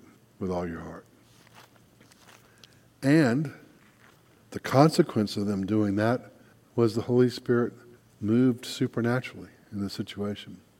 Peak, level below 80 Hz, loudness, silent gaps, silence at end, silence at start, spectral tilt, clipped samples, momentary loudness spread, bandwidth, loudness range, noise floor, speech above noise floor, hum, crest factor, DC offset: -4 dBFS; -64 dBFS; -27 LUFS; none; 0.25 s; 0.4 s; -7 dB/octave; under 0.1%; 17 LU; 16.5 kHz; 5 LU; -58 dBFS; 32 dB; none; 24 dB; under 0.1%